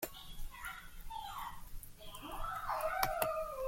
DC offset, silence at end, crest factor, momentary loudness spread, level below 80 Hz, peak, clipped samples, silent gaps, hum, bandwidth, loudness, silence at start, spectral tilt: under 0.1%; 0 s; 26 dB; 16 LU; -50 dBFS; -16 dBFS; under 0.1%; none; none; 16.5 kHz; -41 LUFS; 0 s; -3 dB/octave